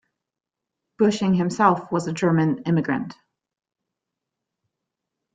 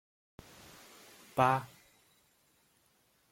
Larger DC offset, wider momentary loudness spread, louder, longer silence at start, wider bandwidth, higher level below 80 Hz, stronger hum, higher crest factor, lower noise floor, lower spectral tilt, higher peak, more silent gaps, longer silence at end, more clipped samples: neither; second, 7 LU vs 25 LU; first, -22 LUFS vs -31 LUFS; second, 1 s vs 1.35 s; second, 9.2 kHz vs 16.5 kHz; first, -64 dBFS vs -72 dBFS; neither; about the same, 22 dB vs 26 dB; first, -86 dBFS vs -71 dBFS; first, -7 dB/octave vs -5.5 dB/octave; first, -2 dBFS vs -12 dBFS; neither; first, 2.2 s vs 1.65 s; neither